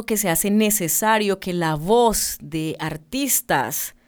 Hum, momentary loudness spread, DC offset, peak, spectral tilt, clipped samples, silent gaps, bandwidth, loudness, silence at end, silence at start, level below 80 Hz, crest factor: none; 9 LU; under 0.1%; -4 dBFS; -3.5 dB/octave; under 0.1%; none; over 20 kHz; -20 LUFS; 0.15 s; 0 s; -46 dBFS; 18 dB